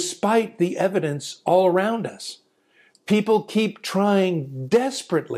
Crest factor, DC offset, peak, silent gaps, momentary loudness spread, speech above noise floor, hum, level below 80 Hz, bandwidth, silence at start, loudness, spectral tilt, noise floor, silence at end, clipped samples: 16 dB; under 0.1%; -6 dBFS; none; 9 LU; 38 dB; none; -72 dBFS; 15 kHz; 0 s; -22 LUFS; -5.5 dB/octave; -60 dBFS; 0 s; under 0.1%